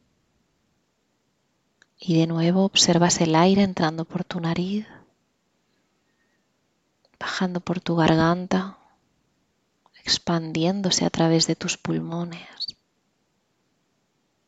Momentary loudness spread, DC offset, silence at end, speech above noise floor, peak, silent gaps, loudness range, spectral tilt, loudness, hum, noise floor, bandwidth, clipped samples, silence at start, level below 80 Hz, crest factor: 15 LU; under 0.1%; 1.75 s; 49 dB; -4 dBFS; none; 10 LU; -4.5 dB/octave; -22 LUFS; none; -71 dBFS; 9 kHz; under 0.1%; 2 s; -58 dBFS; 20 dB